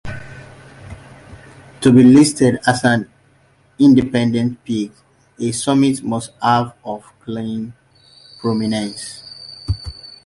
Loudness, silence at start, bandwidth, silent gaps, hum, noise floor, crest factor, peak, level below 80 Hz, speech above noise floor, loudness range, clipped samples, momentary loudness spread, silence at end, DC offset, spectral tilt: -16 LUFS; 0.05 s; 11.5 kHz; none; none; -54 dBFS; 16 dB; -2 dBFS; -42 dBFS; 39 dB; 9 LU; under 0.1%; 22 LU; 0.15 s; under 0.1%; -5.5 dB/octave